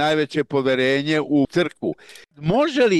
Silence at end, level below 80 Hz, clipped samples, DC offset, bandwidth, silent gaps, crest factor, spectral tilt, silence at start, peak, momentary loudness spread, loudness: 0 s; -54 dBFS; under 0.1%; under 0.1%; 12 kHz; none; 12 dB; -6 dB/octave; 0 s; -8 dBFS; 10 LU; -21 LUFS